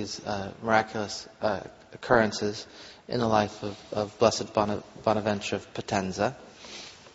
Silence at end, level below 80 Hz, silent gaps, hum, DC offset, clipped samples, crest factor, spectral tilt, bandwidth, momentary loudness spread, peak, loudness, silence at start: 0.05 s; -58 dBFS; none; none; under 0.1%; under 0.1%; 24 dB; -4 dB/octave; 8 kHz; 17 LU; -6 dBFS; -28 LUFS; 0 s